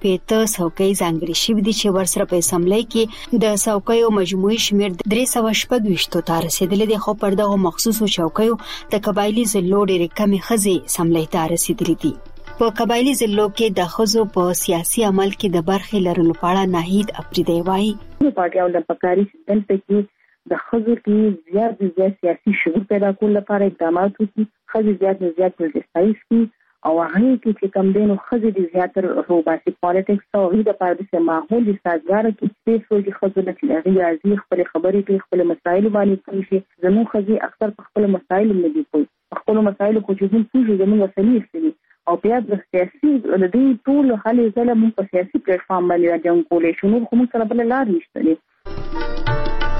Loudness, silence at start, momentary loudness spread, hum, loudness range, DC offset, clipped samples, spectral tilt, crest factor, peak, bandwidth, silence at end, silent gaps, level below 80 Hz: -18 LUFS; 0 s; 5 LU; none; 2 LU; under 0.1%; under 0.1%; -5 dB/octave; 12 dB; -6 dBFS; 16 kHz; 0 s; none; -38 dBFS